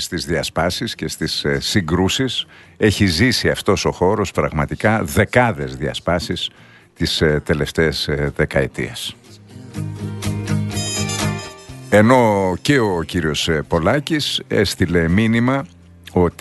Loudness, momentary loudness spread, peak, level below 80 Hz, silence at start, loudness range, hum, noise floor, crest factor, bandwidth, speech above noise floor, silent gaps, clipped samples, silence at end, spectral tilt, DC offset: -18 LUFS; 9 LU; 0 dBFS; -38 dBFS; 0 s; 5 LU; none; -39 dBFS; 18 dB; 12.5 kHz; 21 dB; none; under 0.1%; 0.1 s; -5 dB/octave; under 0.1%